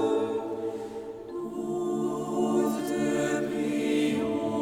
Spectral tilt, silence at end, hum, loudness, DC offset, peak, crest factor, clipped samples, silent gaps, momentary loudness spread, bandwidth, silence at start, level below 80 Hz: -5.5 dB/octave; 0 s; none; -29 LUFS; under 0.1%; -14 dBFS; 14 dB; under 0.1%; none; 10 LU; 17 kHz; 0 s; -64 dBFS